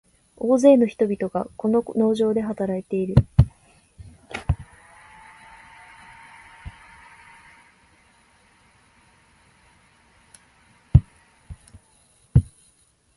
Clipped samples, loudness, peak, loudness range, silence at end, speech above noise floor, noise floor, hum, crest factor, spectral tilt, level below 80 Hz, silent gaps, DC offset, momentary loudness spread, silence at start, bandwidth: under 0.1%; -21 LUFS; 0 dBFS; 25 LU; 0.75 s; 41 dB; -61 dBFS; none; 24 dB; -8.5 dB/octave; -36 dBFS; none; under 0.1%; 28 LU; 0.4 s; 11.5 kHz